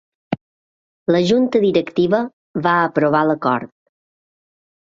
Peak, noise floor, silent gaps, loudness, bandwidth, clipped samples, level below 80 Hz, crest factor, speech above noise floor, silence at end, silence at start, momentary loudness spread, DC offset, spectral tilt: -2 dBFS; under -90 dBFS; 0.41-1.06 s, 2.33-2.54 s; -17 LUFS; 7.6 kHz; under 0.1%; -60 dBFS; 18 dB; over 74 dB; 1.3 s; 0.3 s; 13 LU; under 0.1%; -7 dB/octave